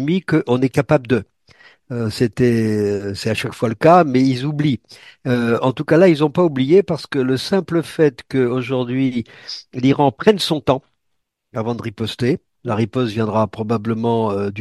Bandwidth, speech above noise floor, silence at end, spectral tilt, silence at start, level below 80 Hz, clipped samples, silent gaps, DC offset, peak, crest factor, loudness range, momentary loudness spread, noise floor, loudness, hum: 12.5 kHz; 56 dB; 0 s; -7 dB/octave; 0 s; -54 dBFS; under 0.1%; none; under 0.1%; 0 dBFS; 18 dB; 5 LU; 11 LU; -73 dBFS; -18 LUFS; none